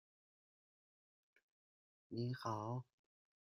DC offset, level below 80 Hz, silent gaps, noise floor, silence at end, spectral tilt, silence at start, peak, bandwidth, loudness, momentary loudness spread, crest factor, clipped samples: under 0.1%; -84 dBFS; none; under -90 dBFS; 0.6 s; -7 dB/octave; 2.1 s; -28 dBFS; 11 kHz; -46 LUFS; 8 LU; 22 dB; under 0.1%